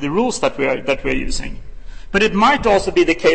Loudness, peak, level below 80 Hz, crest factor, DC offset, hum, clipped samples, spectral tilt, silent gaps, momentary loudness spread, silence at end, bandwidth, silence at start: -17 LUFS; -2 dBFS; -30 dBFS; 14 dB; 3%; none; under 0.1%; -4.5 dB/octave; none; 10 LU; 0 s; 8.8 kHz; 0 s